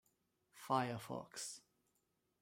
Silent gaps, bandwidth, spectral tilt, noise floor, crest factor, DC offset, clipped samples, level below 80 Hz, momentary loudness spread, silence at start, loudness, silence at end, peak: none; 16 kHz; -4 dB/octave; -84 dBFS; 24 dB; under 0.1%; under 0.1%; -84 dBFS; 16 LU; 0.55 s; -43 LUFS; 0.8 s; -22 dBFS